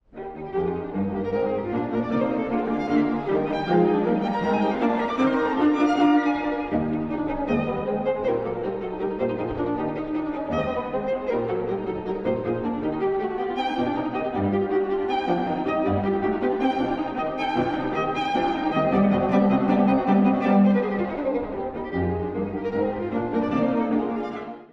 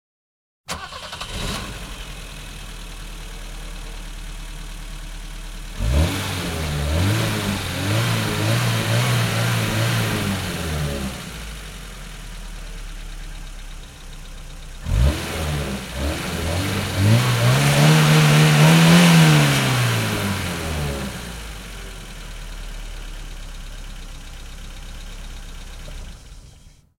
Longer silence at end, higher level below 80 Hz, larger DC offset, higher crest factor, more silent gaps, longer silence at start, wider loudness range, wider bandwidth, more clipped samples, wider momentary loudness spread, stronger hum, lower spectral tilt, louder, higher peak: second, 0.05 s vs 0.3 s; second, -48 dBFS vs -32 dBFS; neither; about the same, 16 dB vs 20 dB; neither; second, 0.15 s vs 0.7 s; second, 6 LU vs 22 LU; second, 7.6 kHz vs 16.5 kHz; neither; second, 8 LU vs 24 LU; neither; first, -8 dB/octave vs -5 dB/octave; second, -24 LUFS vs -19 LUFS; second, -8 dBFS vs -2 dBFS